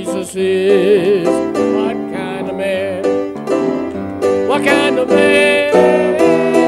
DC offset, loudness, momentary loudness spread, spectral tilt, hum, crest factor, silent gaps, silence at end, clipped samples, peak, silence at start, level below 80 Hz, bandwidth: under 0.1%; -14 LUFS; 10 LU; -5 dB/octave; none; 14 dB; none; 0 s; under 0.1%; 0 dBFS; 0 s; -54 dBFS; 13 kHz